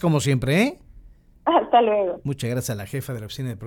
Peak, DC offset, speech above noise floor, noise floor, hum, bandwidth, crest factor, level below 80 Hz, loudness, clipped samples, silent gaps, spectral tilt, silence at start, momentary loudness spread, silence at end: -6 dBFS; under 0.1%; 26 dB; -48 dBFS; none; 18 kHz; 18 dB; -50 dBFS; -22 LUFS; under 0.1%; none; -6 dB/octave; 0 s; 12 LU; 0 s